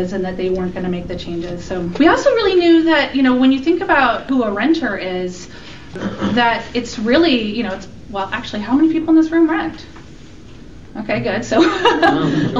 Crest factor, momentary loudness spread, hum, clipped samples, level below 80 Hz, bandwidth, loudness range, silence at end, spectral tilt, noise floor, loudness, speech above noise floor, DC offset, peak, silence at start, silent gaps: 14 dB; 14 LU; none; under 0.1%; -42 dBFS; 7.6 kHz; 5 LU; 0 s; -5.5 dB/octave; -38 dBFS; -16 LUFS; 22 dB; 1%; -2 dBFS; 0 s; none